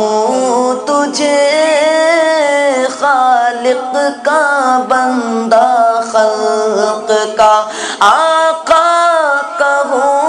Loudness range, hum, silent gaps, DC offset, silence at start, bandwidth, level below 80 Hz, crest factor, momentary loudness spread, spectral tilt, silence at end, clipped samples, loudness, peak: 1 LU; none; none; under 0.1%; 0 s; 12 kHz; -56 dBFS; 10 dB; 4 LU; -2 dB/octave; 0 s; 0.2%; -11 LUFS; 0 dBFS